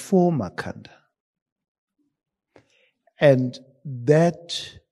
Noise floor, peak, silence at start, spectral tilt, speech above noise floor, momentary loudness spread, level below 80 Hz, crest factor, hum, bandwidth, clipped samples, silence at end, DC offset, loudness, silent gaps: -64 dBFS; -4 dBFS; 0 s; -6.5 dB/octave; 43 dB; 18 LU; -64 dBFS; 20 dB; none; 12.5 kHz; under 0.1%; 0.2 s; under 0.1%; -21 LUFS; 1.20-1.34 s, 1.42-1.46 s, 1.52-1.56 s, 1.68-1.88 s